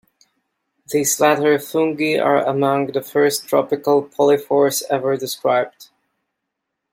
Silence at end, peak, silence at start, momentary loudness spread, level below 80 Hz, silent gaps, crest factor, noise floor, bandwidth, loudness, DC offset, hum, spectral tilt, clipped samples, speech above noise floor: 1.1 s; -2 dBFS; 0.9 s; 5 LU; -68 dBFS; none; 16 dB; -78 dBFS; 16.5 kHz; -18 LUFS; under 0.1%; none; -4 dB/octave; under 0.1%; 61 dB